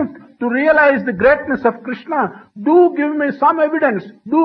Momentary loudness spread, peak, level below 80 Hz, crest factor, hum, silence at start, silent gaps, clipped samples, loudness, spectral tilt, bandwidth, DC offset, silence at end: 11 LU; 0 dBFS; -52 dBFS; 14 dB; none; 0 s; none; under 0.1%; -15 LUFS; -9 dB/octave; 5.4 kHz; under 0.1%; 0 s